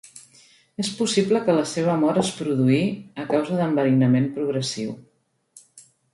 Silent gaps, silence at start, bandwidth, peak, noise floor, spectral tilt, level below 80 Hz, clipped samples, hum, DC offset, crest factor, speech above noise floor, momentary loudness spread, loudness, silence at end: none; 0.15 s; 11.5 kHz; -6 dBFS; -55 dBFS; -6 dB/octave; -64 dBFS; under 0.1%; none; under 0.1%; 18 dB; 33 dB; 11 LU; -22 LUFS; 0.35 s